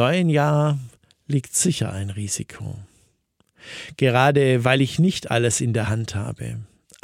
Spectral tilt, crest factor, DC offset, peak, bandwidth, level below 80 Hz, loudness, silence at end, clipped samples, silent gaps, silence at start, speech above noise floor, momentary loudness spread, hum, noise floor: -5 dB/octave; 20 dB; under 0.1%; -2 dBFS; 16 kHz; -54 dBFS; -21 LUFS; 0.4 s; under 0.1%; none; 0 s; 45 dB; 17 LU; none; -66 dBFS